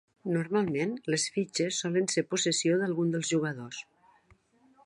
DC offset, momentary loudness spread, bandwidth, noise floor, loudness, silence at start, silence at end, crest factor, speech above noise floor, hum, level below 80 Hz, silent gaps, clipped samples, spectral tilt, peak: under 0.1%; 7 LU; 11.5 kHz; -64 dBFS; -29 LUFS; 0.25 s; 1 s; 16 dB; 35 dB; none; -74 dBFS; none; under 0.1%; -4 dB/octave; -14 dBFS